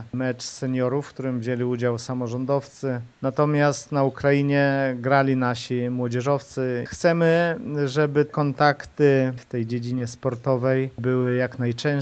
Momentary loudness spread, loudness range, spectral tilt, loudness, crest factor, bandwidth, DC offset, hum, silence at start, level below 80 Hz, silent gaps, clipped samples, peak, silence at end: 8 LU; 3 LU; -6.5 dB/octave; -23 LUFS; 18 dB; 8.8 kHz; under 0.1%; none; 0 s; -60 dBFS; none; under 0.1%; -4 dBFS; 0 s